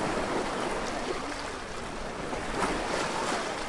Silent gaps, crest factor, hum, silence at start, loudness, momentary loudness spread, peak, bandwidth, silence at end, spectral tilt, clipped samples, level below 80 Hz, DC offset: none; 18 dB; none; 0 s; -32 LUFS; 7 LU; -14 dBFS; 11.5 kHz; 0 s; -3.5 dB/octave; under 0.1%; -46 dBFS; under 0.1%